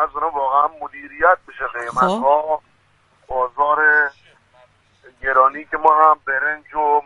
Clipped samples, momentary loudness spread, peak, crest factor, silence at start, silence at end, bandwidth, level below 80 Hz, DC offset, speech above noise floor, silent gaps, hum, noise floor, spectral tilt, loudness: under 0.1%; 12 LU; 0 dBFS; 18 dB; 0 s; 0.05 s; 11 kHz; -52 dBFS; under 0.1%; 40 dB; none; none; -58 dBFS; -5 dB/octave; -17 LUFS